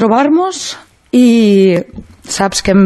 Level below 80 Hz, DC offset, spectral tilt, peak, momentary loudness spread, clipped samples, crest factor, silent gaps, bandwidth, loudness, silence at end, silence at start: -40 dBFS; under 0.1%; -5 dB/octave; 0 dBFS; 15 LU; under 0.1%; 10 dB; none; 12.5 kHz; -11 LUFS; 0 s; 0 s